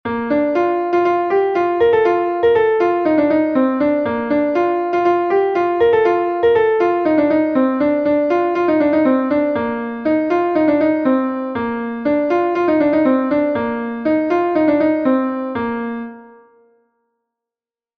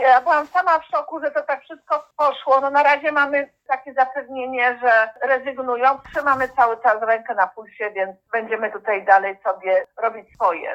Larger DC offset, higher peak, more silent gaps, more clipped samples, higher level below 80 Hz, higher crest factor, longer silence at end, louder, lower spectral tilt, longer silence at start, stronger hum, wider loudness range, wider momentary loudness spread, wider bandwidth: neither; second, -4 dBFS vs 0 dBFS; neither; neither; first, -54 dBFS vs -62 dBFS; second, 12 dB vs 18 dB; first, 1.7 s vs 0 s; first, -16 LUFS vs -20 LUFS; first, -7.5 dB/octave vs -4 dB/octave; about the same, 0.05 s vs 0 s; neither; about the same, 3 LU vs 2 LU; about the same, 7 LU vs 9 LU; second, 6.2 kHz vs 8 kHz